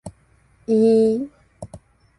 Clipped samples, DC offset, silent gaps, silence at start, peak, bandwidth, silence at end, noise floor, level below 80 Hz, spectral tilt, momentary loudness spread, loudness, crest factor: under 0.1%; under 0.1%; none; 0.05 s; -8 dBFS; 11.5 kHz; 0.4 s; -57 dBFS; -54 dBFS; -8 dB/octave; 25 LU; -18 LUFS; 14 dB